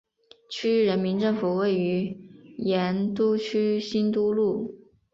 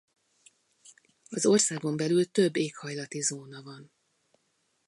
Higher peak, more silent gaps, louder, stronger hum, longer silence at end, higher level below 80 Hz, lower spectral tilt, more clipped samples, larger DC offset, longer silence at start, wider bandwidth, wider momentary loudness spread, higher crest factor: about the same, -12 dBFS vs -12 dBFS; neither; about the same, -25 LUFS vs -27 LUFS; neither; second, 0.35 s vs 1.05 s; first, -66 dBFS vs -78 dBFS; first, -7 dB/octave vs -4 dB/octave; neither; neither; second, 0.5 s vs 1.3 s; second, 7.6 kHz vs 11.5 kHz; second, 10 LU vs 20 LU; second, 12 dB vs 20 dB